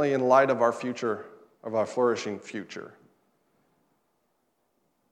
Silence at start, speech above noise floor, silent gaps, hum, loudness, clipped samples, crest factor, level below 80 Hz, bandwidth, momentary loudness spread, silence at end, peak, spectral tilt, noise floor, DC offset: 0 s; 48 dB; none; none; -26 LUFS; under 0.1%; 22 dB; -86 dBFS; 11 kHz; 18 LU; 2.25 s; -8 dBFS; -5.5 dB/octave; -74 dBFS; under 0.1%